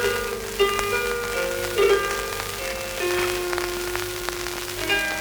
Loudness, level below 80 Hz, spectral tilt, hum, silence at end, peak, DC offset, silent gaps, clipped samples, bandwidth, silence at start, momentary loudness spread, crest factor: -24 LUFS; -42 dBFS; -2.5 dB/octave; none; 0 s; -4 dBFS; under 0.1%; none; under 0.1%; over 20 kHz; 0 s; 8 LU; 20 dB